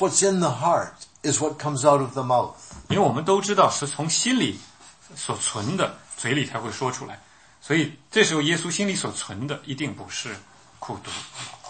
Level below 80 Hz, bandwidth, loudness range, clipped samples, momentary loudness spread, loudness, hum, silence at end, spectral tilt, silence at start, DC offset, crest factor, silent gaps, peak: -60 dBFS; 8.8 kHz; 5 LU; under 0.1%; 16 LU; -24 LUFS; none; 0 s; -3.5 dB/octave; 0 s; under 0.1%; 22 dB; none; -4 dBFS